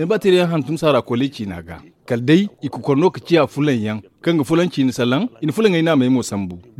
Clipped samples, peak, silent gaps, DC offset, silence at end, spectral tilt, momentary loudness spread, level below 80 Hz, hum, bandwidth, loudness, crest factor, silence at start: under 0.1%; -2 dBFS; none; under 0.1%; 0.2 s; -6.5 dB/octave; 11 LU; -56 dBFS; none; 14.5 kHz; -18 LUFS; 14 dB; 0 s